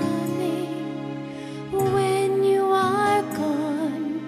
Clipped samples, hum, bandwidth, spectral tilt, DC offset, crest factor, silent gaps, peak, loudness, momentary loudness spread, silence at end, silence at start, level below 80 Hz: under 0.1%; none; 15.5 kHz; -6 dB/octave; under 0.1%; 14 dB; none; -10 dBFS; -23 LUFS; 12 LU; 0 s; 0 s; -60 dBFS